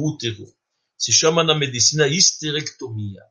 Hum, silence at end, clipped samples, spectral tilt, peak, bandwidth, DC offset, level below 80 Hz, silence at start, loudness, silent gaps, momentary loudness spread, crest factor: none; 0.15 s; under 0.1%; -2.5 dB/octave; 0 dBFS; 11 kHz; under 0.1%; -62 dBFS; 0 s; -17 LUFS; none; 16 LU; 20 dB